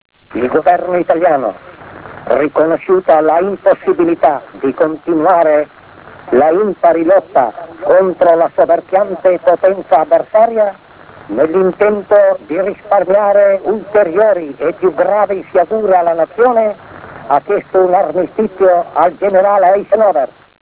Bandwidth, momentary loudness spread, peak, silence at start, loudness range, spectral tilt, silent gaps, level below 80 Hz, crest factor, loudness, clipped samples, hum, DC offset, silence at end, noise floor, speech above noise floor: 4 kHz; 7 LU; 0 dBFS; 0.35 s; 2 LU; -10 dB/octave; none; -52 dBFS; 12 dB; -12 LUFS; under 0.1%; none; under 0.1%; 0.45 s; -36 dBFS; 25 dB